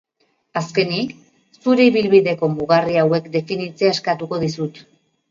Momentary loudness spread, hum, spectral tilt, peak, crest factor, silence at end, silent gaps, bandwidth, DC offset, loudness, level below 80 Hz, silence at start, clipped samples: 12 LU; none; -6 dB/octave; 0 dBFS; 18 dB; 0.5 s; none; 7.6 kHz; under 0.1%; -18 LUFS; -60 dBFS; 0.55 s; under 0.1%